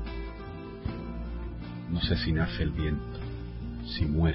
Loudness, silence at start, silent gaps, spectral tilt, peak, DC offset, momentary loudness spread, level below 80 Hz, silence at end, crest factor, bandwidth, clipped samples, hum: -33 LUFS; 0 s; none; -10.5 dB/octave; -14 dBFS; under 0.1%; 12 LU; -38 dBFS; 0 s; 16 dB; 5.8 kHz; under 0.1%; none